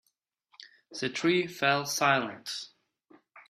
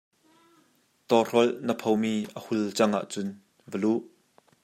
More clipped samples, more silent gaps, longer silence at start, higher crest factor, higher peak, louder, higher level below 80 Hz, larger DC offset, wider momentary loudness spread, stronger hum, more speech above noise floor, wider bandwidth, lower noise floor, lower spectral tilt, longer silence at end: neither; neither; second, 0.6 s vs 1.1 s; about the same, 22 dB vs 22 dB; second, -10 dBFS vs -6 dBFS; about the same, -28 LUFS vs -27 LUFS; about the same, -76 dBFS vs -76 dBFS; neither; about the same, 13 LU vs 11 LU; neither; first, 49 dB vs 40 dB; about the same, 15.5 kHz vs 16 kHz; first, -78 dBFS vs -66 dBFS; second, -3.5 dB/octave vs -5 dB/octave; second, 0.1 s vs 0.55 s